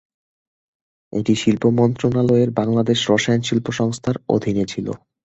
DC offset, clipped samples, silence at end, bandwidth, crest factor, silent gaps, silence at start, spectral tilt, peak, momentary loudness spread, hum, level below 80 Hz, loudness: under 0.1%; under 0.1%; 0.3 s; 8.2 kHz; 18 dB; none; 1.1 s; -6 dB/octave; -2 dBFS; 8 LU; none; -50 dBFS; -19 LUFS